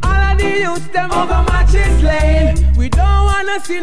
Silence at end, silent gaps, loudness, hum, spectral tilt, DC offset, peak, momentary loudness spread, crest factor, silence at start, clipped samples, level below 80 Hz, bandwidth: 0 s; none; -14 LUFS; none; -6 dB/octave; 9%; -2 dBFS; 4 LU; 10 dB; 0 s; under 0.1%; -14 dBFS; 11 kHz